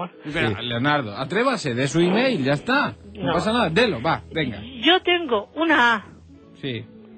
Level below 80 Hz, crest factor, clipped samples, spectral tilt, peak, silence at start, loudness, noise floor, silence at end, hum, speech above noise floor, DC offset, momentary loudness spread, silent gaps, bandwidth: -52 dBFS; 18 dB; under 0.1%; -5 dB/octave; -4 dBFS; 0 s; -21 LUFS; -46 dBFS; 0 s; none; 25 dB; under 0.1%; 11 LU; none; 9 kHz